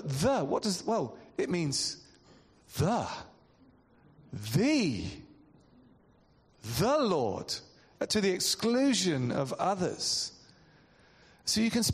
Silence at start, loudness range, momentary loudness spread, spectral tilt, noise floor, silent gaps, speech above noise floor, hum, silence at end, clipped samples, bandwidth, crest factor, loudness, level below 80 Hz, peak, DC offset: 0 s; 6 LU; 12 LU; -4 dB/octave; -64 dBFS; none; 34 dB; none; 0 s; under 0.1%; 14 kHz; 16 dB; -30 LUFS; -60 dBFS; -16 dBFS; under 0.1%